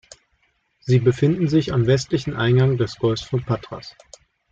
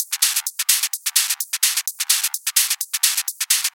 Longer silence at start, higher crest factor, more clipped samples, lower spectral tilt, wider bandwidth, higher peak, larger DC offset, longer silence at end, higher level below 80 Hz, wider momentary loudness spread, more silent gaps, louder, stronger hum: first, 0.85 s vs 0 s; about the same, 16 dB vs 20 dB; neither; first, -7 dB/octave vs 10.5 dB/octave; second, 7.6 kHz vs over 20 kHz; second, -6 dBFS vs 0 dBFS; neither; first, 0.6 s vs 0.05 s; first, -48 dBFS vs under -90 dBFS; first, 15 LU vs 2 LU; neither; about the same, -20 LUFS vs -18 LUFS; neither